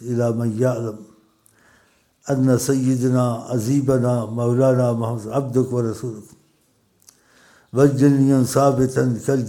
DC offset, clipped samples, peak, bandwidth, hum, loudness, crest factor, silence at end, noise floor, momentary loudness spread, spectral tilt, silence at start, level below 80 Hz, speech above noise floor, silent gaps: under 0.1%; under 0.1%; -2 dBFS; 17 kHz; none; -19 LUFS; 18 dB; 0 s; -62 dBFS; 11 LU; -7.5 dB/octave; 0 s; -56 dBFS; 44 dB; none